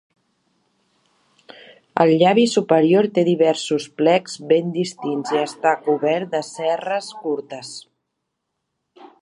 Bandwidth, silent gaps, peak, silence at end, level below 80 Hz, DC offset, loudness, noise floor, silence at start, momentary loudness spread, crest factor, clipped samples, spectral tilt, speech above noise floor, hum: 11 kHz; none; 0 dBFS; 1.4 s; -72 dBFS; under 0.1%; -19 LUFS; -77 dBFS; 1.95 s; 12 LU; 20 dB; under 0.1%; -5.5 dB/octave; 59 dB; none